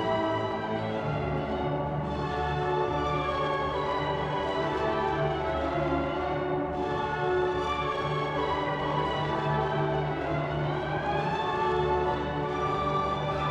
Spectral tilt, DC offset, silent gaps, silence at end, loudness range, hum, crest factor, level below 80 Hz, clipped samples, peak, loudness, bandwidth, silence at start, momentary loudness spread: -7 dB/octave; under 0.1%; none; 0 s; 1 LU; none; 14 dB; -44 dBFS; under 0.1%; -16 dBFS; -29 LUFS; 8.6 kHz; 0 s; 3 LU